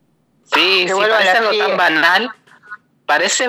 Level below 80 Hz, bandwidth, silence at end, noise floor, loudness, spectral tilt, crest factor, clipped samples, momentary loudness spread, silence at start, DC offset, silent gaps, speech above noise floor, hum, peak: -78 dBFS; 16 kHz; 0 s; -57 dBFS; -13 LUFS; -1 dB/octave; 16 dB; under 0.1%; 6 LU; 0.5 s; under 0.1%; none; 43 dB; none; 0 dBFS